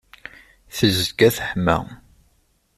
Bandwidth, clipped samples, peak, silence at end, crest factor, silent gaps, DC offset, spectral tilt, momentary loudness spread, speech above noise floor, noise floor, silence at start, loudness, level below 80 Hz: 15.5 kHz; under 0.1%; -4 dBFS; 0.8 s; 20 dB; none; under 0.1%; -4.5 dB/octave; 23 LU; 44 dB; -63 dBFS; 0.75 s; -19 LUFS; -46 dBFS